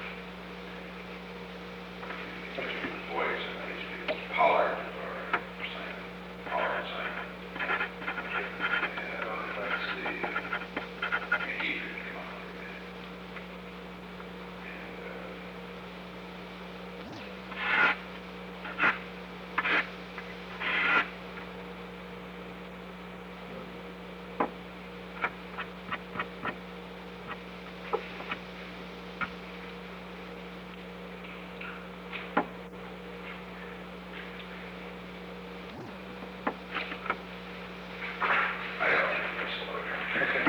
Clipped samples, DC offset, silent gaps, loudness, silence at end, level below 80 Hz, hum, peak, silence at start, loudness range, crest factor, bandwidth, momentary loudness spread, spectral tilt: under 0.1%; under 0.1%; none; -34 LUFS; 0 s; -58 dBFS; 60 Hz at -50 dBFS; -12 dBFS; 0 s; 11 LU; 24 dB; over 20 kHz; 15 LU; -5.5 dB/octave